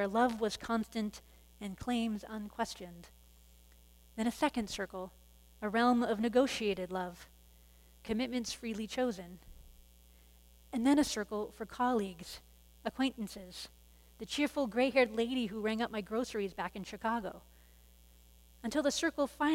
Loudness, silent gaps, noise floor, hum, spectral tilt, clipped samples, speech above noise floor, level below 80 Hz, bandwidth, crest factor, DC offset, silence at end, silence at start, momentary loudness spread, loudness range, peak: -35 LUFS; none; -61 dBFS; none; -4 dB/octave; under 0.1%; 26 dB; -60 dBFS; 16.5 kHz; 22 dB; under 0.1%; 0 s; 0 s; 17 LU; 6 LU; -14 dBFS